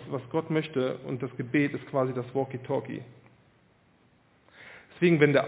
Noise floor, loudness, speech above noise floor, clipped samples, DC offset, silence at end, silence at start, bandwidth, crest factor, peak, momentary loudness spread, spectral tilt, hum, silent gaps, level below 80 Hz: -63 dBFS; -29 LUFS; 36 dB; under 0.1%; under 0.1%; 0 s; 0 s; 4 kHz; 24 dB; -6 dBFS; 16 LU; -6 dB/octave; none; none; -70 dBFS